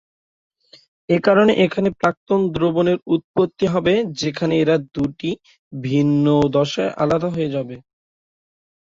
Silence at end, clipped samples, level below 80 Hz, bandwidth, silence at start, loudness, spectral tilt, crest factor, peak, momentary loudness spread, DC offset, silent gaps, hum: 1.05 s; under 0.1%; -52 dBFS; 7.8 kHz; 1.1 s; -19 LUFS; -7 dB/octave; 18 dB; -2 dBFS; 11 LU; under 0.1%; 2.17-2.27 s, 3.24-3.34 s, 5.59-5.71 s; none